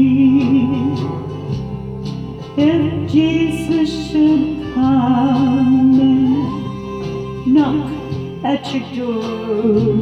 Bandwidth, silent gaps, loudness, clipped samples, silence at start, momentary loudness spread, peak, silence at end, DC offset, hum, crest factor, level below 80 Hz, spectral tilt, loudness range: 10 kHz; none; -16 LUFS; under 0.1%; 0 s; 13 LU; -2 dBFS; 0 s; under 0.1%; none; 12 dB; -42 dBFS; -8 dB/octave; 4 LU